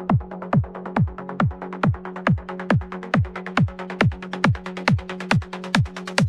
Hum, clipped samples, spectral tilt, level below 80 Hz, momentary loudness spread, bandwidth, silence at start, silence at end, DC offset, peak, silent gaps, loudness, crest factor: none; under 0.1%; -6.5 dB/octave; -40 dBFS; 2 LU; 12 kHz; 0 s; 0 s; under 0.1%; -2 dBFS; none; -23 LUFS; 20 dB